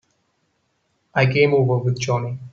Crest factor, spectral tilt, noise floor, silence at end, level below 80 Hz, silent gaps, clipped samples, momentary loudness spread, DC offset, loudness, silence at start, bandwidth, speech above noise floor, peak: 18 dB; -6 dB/octave; -69 dBFS; 0.05 s; -56 dBFS; none; under 0.1%; 8 LU; under 0.1%; -19 LUFS; 1.15 s; 7.2 kHz; 50 dB; -4 dBFS